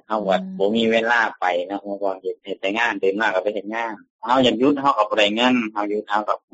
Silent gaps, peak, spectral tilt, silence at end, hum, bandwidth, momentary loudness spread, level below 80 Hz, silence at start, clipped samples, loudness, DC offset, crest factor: 4.10-4.19 s; -4 dBFS; -2 dB/octave; 0.15 s; none; 8 kHz; 10 LU; -64 dBFS; 0.1 s; under 0.1%; -20 LUFS; under 0.1%; 16 dB